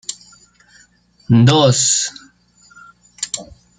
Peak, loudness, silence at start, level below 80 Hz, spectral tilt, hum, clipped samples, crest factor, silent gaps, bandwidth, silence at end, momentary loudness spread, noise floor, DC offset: 0 dBFS; -15 LUFS; 0.1 s; -52 dBFS; -4 dB/octave; 60 Hz at -35 dBFS; under 0.1%; 18 dB; none; 9.6 kHz; 0.35 s; 17 LU; -52 dBFS; under 0.1%